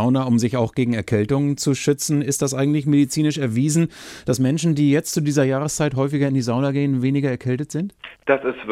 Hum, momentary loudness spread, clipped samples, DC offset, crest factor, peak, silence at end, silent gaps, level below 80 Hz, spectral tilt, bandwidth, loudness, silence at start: none; 6 LU; under 0.1%; under 0.1%; 16 dB; -4 dBFS; 0 s; none; -54 dBFS; -6 dB/octave; 16 kHz; -20 LUFS; 0 s